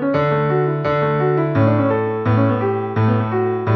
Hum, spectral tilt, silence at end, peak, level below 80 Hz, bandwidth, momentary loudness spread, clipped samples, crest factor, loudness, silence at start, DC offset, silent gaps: none; -10.5 dB/octave; 0 s; -2 dBFS; -50 dBFS; 5.8 kHz; 3 LU; under 0.1%; 14 dB; -18 LUFS; 0 s; under 0.1%; none